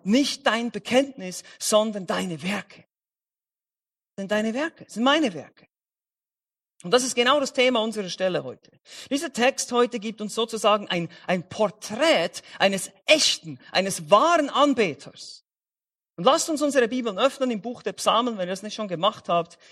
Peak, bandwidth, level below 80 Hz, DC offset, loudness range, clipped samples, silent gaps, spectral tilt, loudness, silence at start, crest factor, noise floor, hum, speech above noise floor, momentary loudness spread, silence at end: -2 dBFS; 14.5 kHz; -70 dBFS; under 0.1%; 6 LU; under 0.1%; none; -3 dB/octave; -23 LUFS; 0.05 s; 22 dB; under -90 dBFS; none; over 66 dB; 11 LU; 0.25 s